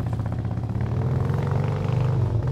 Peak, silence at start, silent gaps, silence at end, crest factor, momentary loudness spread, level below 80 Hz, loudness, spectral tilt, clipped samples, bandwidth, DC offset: -12 dBFS; 0 s; none; 0 s; 12 dB; 5 LU; -40 dBFS; -25 LUFS; -9 dB/octave; under 0.1%; 7.8 kHz; under 0.1%